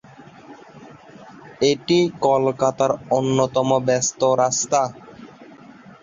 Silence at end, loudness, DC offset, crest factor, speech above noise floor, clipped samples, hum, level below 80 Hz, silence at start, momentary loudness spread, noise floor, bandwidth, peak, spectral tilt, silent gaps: 0.6 s; -19 LUFS; under 0.1%; 18 dB; 25 dB; under 0.1%; none; -60 dBFS; 0.2 s; 4 LU; -44 dBFS; 7.8 kHz; -4 dBFS; -4.5 dB/octave; none